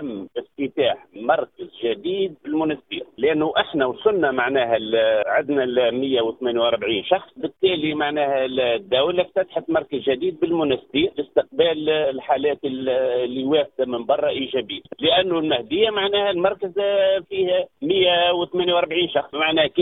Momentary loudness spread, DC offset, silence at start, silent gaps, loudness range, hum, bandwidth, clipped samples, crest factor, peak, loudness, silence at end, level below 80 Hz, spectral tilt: 6 LU; under 0.1%; 0 s; none; 2 LU; none; 4.1 kHz; under 0.1%; 18 dB; -4 dBFS; -21 LUFS; 0 s; -58 dBFS; -8.5 dB/octave